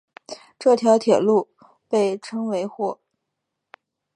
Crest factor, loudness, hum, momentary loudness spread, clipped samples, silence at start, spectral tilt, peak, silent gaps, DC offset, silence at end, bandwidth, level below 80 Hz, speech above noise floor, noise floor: 20 dB; -21 LUFS; none; 22 LU; under 0.1%; 0.3 s; -5.5 dB/octave; -4 dBFS; none; under 0.1%; 1.2 s; 11 kHz; -76 dBFS; 61 dB; -80 dBFS